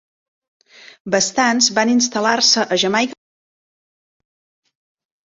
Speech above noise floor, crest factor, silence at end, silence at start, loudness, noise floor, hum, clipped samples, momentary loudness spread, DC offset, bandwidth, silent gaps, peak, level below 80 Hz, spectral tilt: over 74 dB; 18 dB; 2.1 s; 1.05 s; -15 LUFS; under -90 dBFS; none; under 0.1%; 7 LU; under 0.1%; 8 kHz; none; -2 dBFS; -64 dBFS; -2 dB/octave